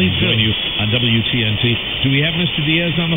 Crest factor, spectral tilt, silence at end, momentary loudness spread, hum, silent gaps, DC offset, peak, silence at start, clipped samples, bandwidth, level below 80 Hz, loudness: 14 dB; -9.5 dB/octave; 0 s; 3 LU; none; none; under 0.1%; -2 dBFS; 0 s; under 0.1%; 16.5 kHz; -38 dBFS; -15 LUFS